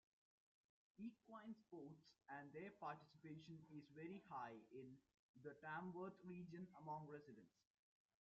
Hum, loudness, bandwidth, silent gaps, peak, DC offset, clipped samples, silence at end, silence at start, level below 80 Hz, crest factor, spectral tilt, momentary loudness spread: none; -58 LUFS; 7.2 kHz; 5.19-5.34 s; -40 dBFS; under 0.1%; under 0.1%; 0.75 s; 1 s; under -90 dBFS; 18 dB; -6 dB/octave; 8 LU